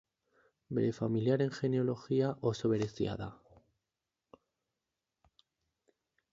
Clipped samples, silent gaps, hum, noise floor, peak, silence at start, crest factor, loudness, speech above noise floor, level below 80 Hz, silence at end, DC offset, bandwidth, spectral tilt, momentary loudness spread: under 0.1%; none; none; -90 dBFS; -18 dBFS; 0.7 s; 18 dB; -34 LUFS; 57 dB; -66 dBFS; 3 s; under 0.1%; 7.8 kHz; -7.5 dB/octave; 6 LU